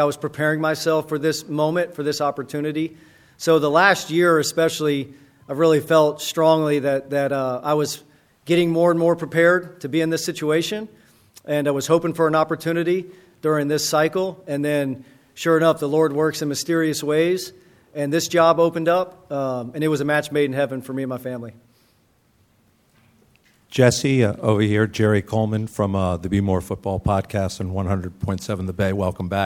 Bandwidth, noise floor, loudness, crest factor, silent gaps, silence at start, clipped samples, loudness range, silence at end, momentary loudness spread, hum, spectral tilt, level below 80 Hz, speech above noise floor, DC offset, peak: 17 kHz; -61 dBFS; -21 LUFS; 20 dB; none; 0 s; under 0.1%; 4 LU; 0 s; 10 LU; none; -5.5 dB/octave; -50 dBFS; 40 dB; under 0.1%; 0 dBFS